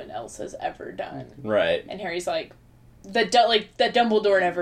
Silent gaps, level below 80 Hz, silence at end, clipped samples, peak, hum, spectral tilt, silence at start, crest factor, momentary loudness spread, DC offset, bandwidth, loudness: none; -58 dBFS; 0 s; under 0.1%; -6 dBFS; none; -3.5 dB/octave; 0 s; 18 dB; 16 LU; under 0.1%; 14 kHz; -23 LUFS